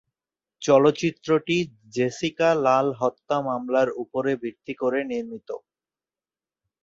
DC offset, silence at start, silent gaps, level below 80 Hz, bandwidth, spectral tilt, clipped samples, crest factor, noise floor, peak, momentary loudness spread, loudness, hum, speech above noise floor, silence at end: under 0.1%; 0.6 s; none; -66 dBFS; 7.8 kHz; -5.5 dB/octave; under 0.1%; 20 dB; under -90 dBFS; -6 dBFS; 13 LU; -24 LUFS; none; over 67 dB; 1.25 s